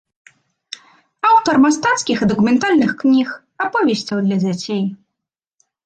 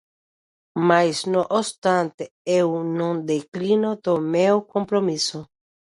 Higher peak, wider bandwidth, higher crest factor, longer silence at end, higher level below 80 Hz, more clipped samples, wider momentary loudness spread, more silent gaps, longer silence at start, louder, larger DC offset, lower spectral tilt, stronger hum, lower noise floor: about the same, -4 dBFS vs -4 dBFS; second, 9.2 kHz vs 11.5 kHz; about the same, 14 dB vs 18 dB; first, 0.9 s vs 0.55 s; first, -56 dBFS vs -68 dBFS; neither; first, 12 LU vs 7 LU; second, none vs 1.78-1.82 s, 2.14-2.18 s, 2.31-2.45 s, 3.48-3.52 s; first, 1.25 s vs 0.75 s; first, -16 LUFS vs -22 LUFS; neither; about the same, -5 dB/octave vs -5 dB/octave; neither; second, -81 dBFS vs under -90 dBFS